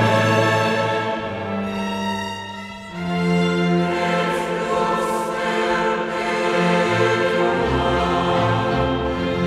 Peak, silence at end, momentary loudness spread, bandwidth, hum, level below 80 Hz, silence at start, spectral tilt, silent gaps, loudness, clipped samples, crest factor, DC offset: -4 dBFS; 0 s; 8 LU; 14 kHz; none; -40 dBFS; 0 s; -6 dB/octave; none; -20 LUFS; under 0.1%; 16 dB; under 0.1%